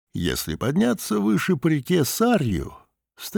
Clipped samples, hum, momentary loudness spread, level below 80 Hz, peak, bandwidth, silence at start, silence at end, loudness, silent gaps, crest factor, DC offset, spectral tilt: under 0.1%; none; 7 LU; -46 dBFS; -8 dBFS; over 20 kHz; 0.15 s; 0 s; -22 LUFS; none; 14 dB; under 0.1%; -5.5 dB/octave